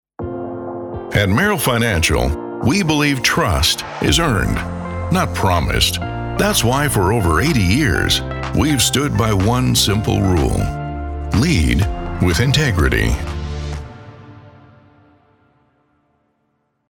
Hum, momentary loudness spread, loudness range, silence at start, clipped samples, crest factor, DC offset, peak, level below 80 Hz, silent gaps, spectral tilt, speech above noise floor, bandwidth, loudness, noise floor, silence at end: none; 11 LU; 5 LU; 0.2 s; under 0.1%; 16 dB; under 0.1%; -2 dBFS; -28 dBFS; none; -4.5 dB/octave; 51 dB; over 20 kHz; -17 LUFS; -67 dBFS; 2.4 s